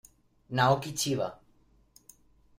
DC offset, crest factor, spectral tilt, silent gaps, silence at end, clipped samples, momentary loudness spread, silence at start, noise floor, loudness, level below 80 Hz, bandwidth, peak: under 0.1%; 22 dB; -4.5 dB/octave; none; 1.25 s; under 0.1%; 10 LU; 0.5 s; -64 dBFS; -29 LUFS; -62 dBFS; 16 kHz; -12 dBFS